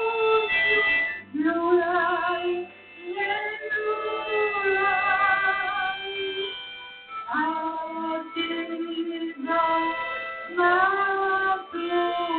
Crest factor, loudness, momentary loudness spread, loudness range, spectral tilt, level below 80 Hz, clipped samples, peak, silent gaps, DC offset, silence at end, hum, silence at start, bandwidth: 18 dB; -24 LUFS; 11 LU; 5 LU; -7.5 dB/octave; -62 dBFS; under 0.1%; -8 dBFS; none; under 0.1%; 0 s; none; 0 s; 4.6 kHz